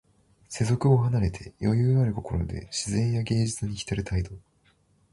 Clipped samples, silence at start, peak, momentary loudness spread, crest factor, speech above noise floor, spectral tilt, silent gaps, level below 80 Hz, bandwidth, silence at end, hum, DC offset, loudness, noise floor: under 0.1%; 0.5 s; -8 dBFS; 9 LU; 18 dB; 39 dB; -6.5 dB/octave; none; -42 dBFS; 11.5 kHz; 0.75 s; none; under 0.1%; -26 LUFS; -65 dBFS